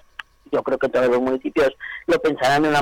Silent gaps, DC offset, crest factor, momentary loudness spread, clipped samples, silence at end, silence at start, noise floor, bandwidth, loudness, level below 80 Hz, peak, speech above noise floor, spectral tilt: none; under 0.1%; 8 dB; 10 LU; under 0.1%; 0 s; 0.5 s; -42 dBFS; 17 kHz; -20 LUFS; -52 dBFS; -12 dBFS; 22 dB; -5 dB/octave